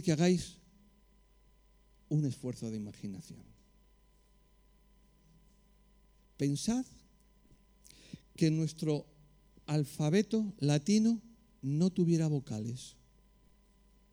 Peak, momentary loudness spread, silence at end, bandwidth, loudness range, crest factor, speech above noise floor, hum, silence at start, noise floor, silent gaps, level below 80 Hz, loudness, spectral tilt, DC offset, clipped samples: -16 dBFS; 19 LU; 1.2 s; over 20 kHz; 11 LU; 18 dB; 34 dB; none; 0 s; -66 dBFS; none; -64 dBFS; -33 LUFS; -6.5 dB/octave; under 0.1%; under 0.1%